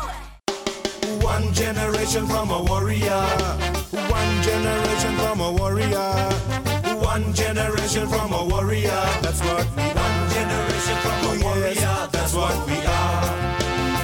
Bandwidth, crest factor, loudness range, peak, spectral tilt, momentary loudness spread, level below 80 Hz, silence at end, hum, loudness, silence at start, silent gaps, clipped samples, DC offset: 19 kHz; 16 dB; 1 LU; -6 dBFS; -4.5 dB/octave; 3 LU; -30 dBFS; 0 s; none; -22 LUFS; 0 s; none; under 0.1%; under 0.1%